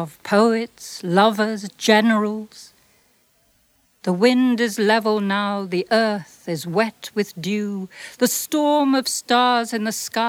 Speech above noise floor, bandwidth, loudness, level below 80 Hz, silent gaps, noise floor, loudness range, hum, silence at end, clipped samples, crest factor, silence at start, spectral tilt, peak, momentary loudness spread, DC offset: 42 dB; 17 kHz; -20 LUFS; -70 dBFS; none; -62 dBFS; 2 LU; none; 0 s; under 0.1%; 18 dB; 0 s; -4 dB/octave; -2 dBFS; 12 LU; under 0.1%